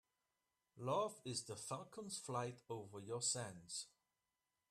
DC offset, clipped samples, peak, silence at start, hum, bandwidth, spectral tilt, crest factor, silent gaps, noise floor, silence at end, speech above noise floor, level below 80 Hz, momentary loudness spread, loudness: under 0.1%; under 0.1%; -28 dBFS; 0.75 s; none; 14 kHz; -3.5 dB/octave; 20 dB; none; under -90 dBFS; 0.85 s; over 44 dB; -84 dBFS; 10 LU; -46 LUFS